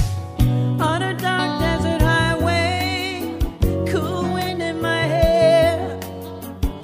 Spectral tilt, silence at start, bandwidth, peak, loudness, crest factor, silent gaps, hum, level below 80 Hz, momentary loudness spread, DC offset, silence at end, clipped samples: -6 dB/octave; 0 s; 16 kHz; -4 dBFS; -20 LUFS; 16 dB; none; none; -30 dBFS; 11 LU; under 0.1%; 0 s; under 0.1%